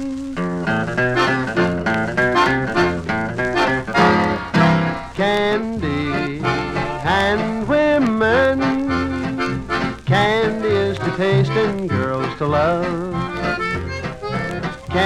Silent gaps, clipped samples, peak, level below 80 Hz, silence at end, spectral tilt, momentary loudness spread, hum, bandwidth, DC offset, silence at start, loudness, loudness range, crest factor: none; under 0.1%; -2 dBFS; -40 dBFS; 0 s; -6.5 dB/octave; 8 LU; none; 12.5 kHz; under 0.1%; 0 s; -19 LUFS; 2 LU; 16 dB